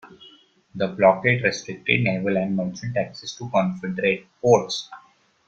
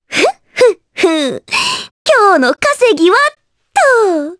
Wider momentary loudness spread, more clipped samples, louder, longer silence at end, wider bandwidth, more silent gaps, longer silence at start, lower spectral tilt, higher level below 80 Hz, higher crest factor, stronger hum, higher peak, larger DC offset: first, 11 LU vs 7 LU; neither; second, -22 LUFS vs -11 LUFS; first, 0.5 s vs 0.05 s; second, 7.8 kHz vs 11 kHz; second, none vs 1.91-2.05 s; about the same, 0.05 s vs 0.1 s; first, -5.5 dB/octave vs -2 dB/octave; about the same, -60 dBFS vs -56 dBFS; first, 20 dB vs 12 dB; neither; about the same, -2 dBFS vs 0 dBFS; neither